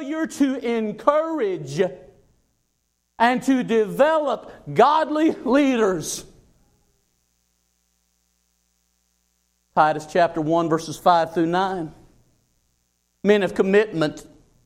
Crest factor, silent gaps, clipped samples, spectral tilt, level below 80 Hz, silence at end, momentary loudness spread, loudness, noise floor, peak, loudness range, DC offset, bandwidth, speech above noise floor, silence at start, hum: 20 dB; none; under 0.1%; -5.5 dB/octave; -58 dBFS; 0.4 s; 8 LU; -21 LUFS; -72 dBFS; -2 dBFS; 6 LU; under 0.1%; 15.5 kHz; 52 dB; 0 s; 60 Hz at -50 dBFS